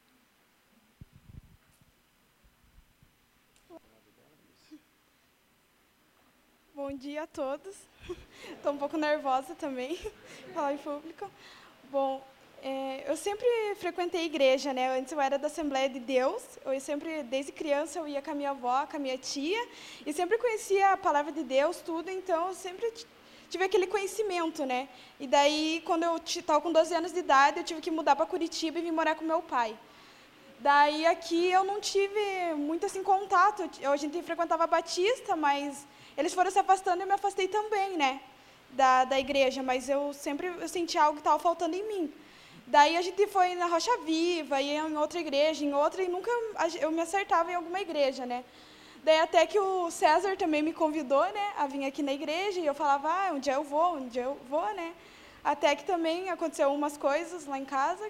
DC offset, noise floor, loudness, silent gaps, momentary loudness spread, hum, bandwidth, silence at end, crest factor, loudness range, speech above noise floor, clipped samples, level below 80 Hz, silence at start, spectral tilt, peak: under 0.1%; -67 dBFS; -29 LUFS; none; 12 LU; none; 16 kHz; 0 s; 22 dB; 7 LU; 38 dB; under 0.1%; -66 dBFS; 3.7 s; -2 dB/octave; -8 dBFS